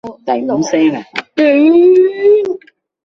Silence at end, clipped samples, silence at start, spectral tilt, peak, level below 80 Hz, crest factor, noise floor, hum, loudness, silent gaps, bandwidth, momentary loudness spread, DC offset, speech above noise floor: 0.5 s; under 0.1%; 0.05 s; -5.5 dB/octave; -2 dBFS; -58 dBFS; 10 dB; -35 dBFS; none; -11 LUFS; none; 7.2 kHz; 13 LU; under 0.1%; 25 dB